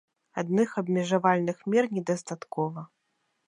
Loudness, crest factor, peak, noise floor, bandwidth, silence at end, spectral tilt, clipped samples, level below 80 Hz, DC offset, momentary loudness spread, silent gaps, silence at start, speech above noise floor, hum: -28 LUFS; 20 dB; -8 dBFS; -76 dBFS; 10.5 kHz; 0.6 s; -6.5 dB/octave; under 0.1%; -78 dBFS; under 0.1%; 11 LU; none; 0.35 s; 49 dB; none